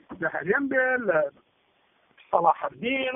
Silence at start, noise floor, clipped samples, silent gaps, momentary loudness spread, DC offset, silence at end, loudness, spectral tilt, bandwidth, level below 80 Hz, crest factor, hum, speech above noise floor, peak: 0.1 s; -67 dBFS; under 0.1%; none; 7 LU; under 0.1%; 0 s; -25 LUFS; 1 dB/octave; 3.8 kHz; -66 dBFS; 20 dB; none; 42 dB; -6 dBFS